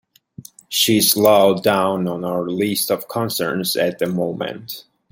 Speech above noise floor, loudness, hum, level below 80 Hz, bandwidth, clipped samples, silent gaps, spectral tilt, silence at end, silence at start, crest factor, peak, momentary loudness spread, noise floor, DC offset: 24 dB; -18 LUFS; none; -62 dBFS; 17 kHz; under 0.1%; none; -3.5 dB/octave; 0.3 s; 0.4 s; 18 dB; 0 dBFS; 13 LU; -42 dBFS; under 0.1%